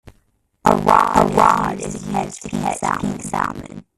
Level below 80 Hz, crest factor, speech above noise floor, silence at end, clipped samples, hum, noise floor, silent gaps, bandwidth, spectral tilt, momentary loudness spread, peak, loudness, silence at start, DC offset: -42 dBFS; 18 dB; 39 dB; 0.15 s; under 0.1%; none; -62 dBFS; none; 14.5 kHz; -5.5 dB/octave; 11 LU; 0 dBFS; -18 LUFS; 0.05 s; under 0.1%